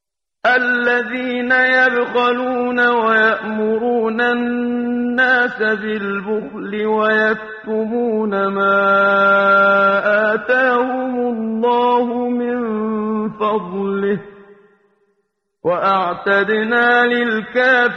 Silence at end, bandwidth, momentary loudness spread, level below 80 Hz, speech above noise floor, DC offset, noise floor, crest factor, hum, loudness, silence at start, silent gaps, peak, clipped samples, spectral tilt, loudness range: 0 s; 6.6 kHz; 9 LU; -60 dBFS; 53 dB; under 0.1%; -69 dBFS; 14 dB; none; -16 LUFS; 0.45 s; none; -2 dBFS; under 0.1%; -6.5 dB/octave; 6 LU